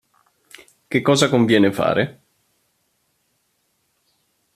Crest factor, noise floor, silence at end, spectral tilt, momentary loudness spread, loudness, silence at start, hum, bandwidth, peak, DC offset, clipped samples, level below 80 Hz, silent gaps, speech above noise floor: 20 dB; -68 dBFS; 2.45 s; -5 dB/octave; 8 LU; -18 LUFS; 0.9 s; none; 14.5 kHz; -2 dBFS; under 0.1%; under 0.1%; -62 dBFS; none; 52 dB